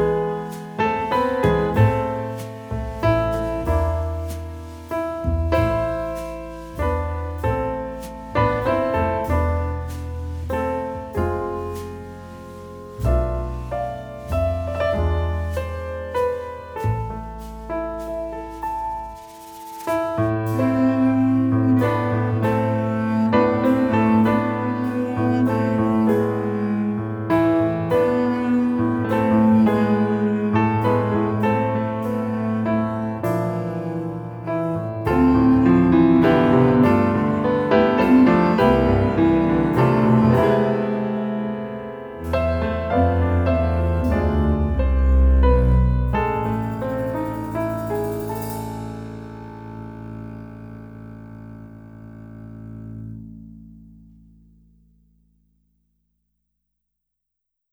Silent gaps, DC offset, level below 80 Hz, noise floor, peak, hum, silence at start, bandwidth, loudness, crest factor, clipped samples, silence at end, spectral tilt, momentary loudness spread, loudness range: none; under 0.1%; -30 dBFS; -80 dBFS; -2 dBFS; none; 0 s; over 20 kHz; -20 LUFS; 18 dB; under 0.1%; 3.95 s; -8.5 dB/octave; 19 LU; 12 LU